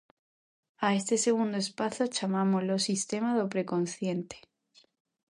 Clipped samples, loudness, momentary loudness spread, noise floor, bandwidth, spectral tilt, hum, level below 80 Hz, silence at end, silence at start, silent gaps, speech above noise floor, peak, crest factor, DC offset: under 0.1%; -30 LUFS; 7 LU; -65 dBFS; 11.5 kHz; -4.5 dB/octave; none; -76 dBFS; 0.95 s; 0.8 s; none; 36 dB; -14 dBFS; 18 dB; under 0.1%